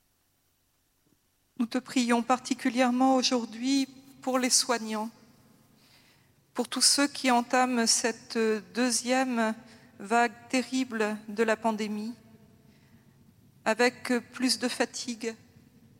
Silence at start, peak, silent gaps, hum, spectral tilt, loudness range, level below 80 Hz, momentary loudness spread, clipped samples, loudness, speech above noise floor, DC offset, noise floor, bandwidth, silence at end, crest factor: 1.6 s; -8 dBFS; none; none; -2 dB/octave; 5 LU; -78 dBFS; 12 LU; under 0.1%; -27 LUFS; 44 dB; under 0.1%; -72 dBFS; 16 kHz; 0.65 s; 22 dB